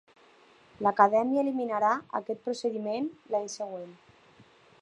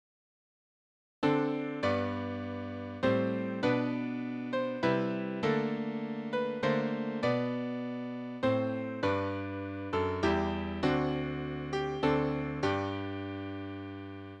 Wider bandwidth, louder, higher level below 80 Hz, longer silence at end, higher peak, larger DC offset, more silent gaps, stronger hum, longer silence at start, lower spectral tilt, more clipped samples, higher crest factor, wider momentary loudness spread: first, 11 kHz vs 8.8 kHz; first, -29 LUFS vs -33 LUFS; second, -78 dBFS vs -56 dBFS; first, 0.85 s vs 0 s; first, -6 dBFS vs -14 dBFS; neither; neither; neither; second, 0.8 s vs 1.2 s; second, -5 dB/octave vs -7.5 dB/octave; neither; first, 24 dB vs 18 dB; first, 14 LU vs 9 LU